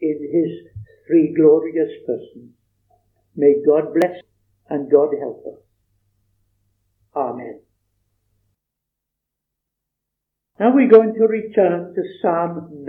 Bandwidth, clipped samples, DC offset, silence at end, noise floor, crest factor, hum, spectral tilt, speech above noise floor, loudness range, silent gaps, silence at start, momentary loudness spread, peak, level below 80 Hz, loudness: 4.1 kHz; under 0.1%; under 0.1%; 0 s; -81 dBFS; 20 dB; none; -9 dB/octave; 64 dB; 16 LU; none; 0 s; 18 LU; 0 dBFS; -66 dBFS; -17 LUFS